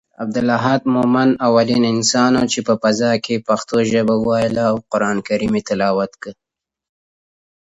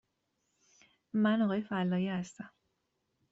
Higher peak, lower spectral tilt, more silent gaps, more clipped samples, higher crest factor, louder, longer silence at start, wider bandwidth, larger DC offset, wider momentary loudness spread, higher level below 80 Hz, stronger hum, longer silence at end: first, 0 dBFS vs -20 dBFS; second, -5 dB/octave vs -7 dB/octave; neither; neither; about the same, 16 dB vs 14 dB; first, -17 LUFS vs -32 LUFS; second, 0.2 s vs 1.15 s; about the same, 8.2 kHz vs 8 kHz; neither; second, 5 LU vs 18 LU; first, -52 dBFS vs -76 dBFS; neither; first, 1.35 s vs 0.85 s